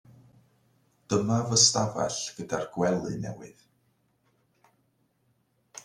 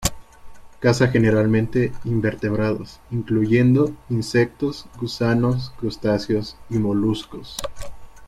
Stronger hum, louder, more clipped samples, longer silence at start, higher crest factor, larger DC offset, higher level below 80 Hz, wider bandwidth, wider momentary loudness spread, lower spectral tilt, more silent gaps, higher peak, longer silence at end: neither; second, -26 LUFS vs -21 LUFS; neither; first, 1.1 s vs 0 s; first, 26 dB vs 18 dB; neither; second, -64 dBFS vs -42 dBFS; second, 13.5 kHz vs 15.5 kHz; first, 17 LU vs 13 LU; second, -3.5 dB/octave vs -6.5 dB/octave; neither; second, -6 dBFS vs -2 dBFS; about the same, 0 s vs 0 s